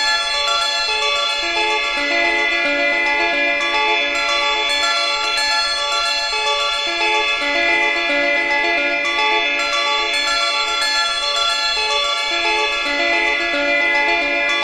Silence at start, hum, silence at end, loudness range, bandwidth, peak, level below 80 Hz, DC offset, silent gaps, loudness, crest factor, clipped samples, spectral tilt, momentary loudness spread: 0 s; none; 0 s; 1 LU; 13.5 kHz; -4 dBFS; -48 dBFS; under 0.1%; none; -16 LUFS; 14 dB; under 0.1%; 0.5 dB/octave; 2 LU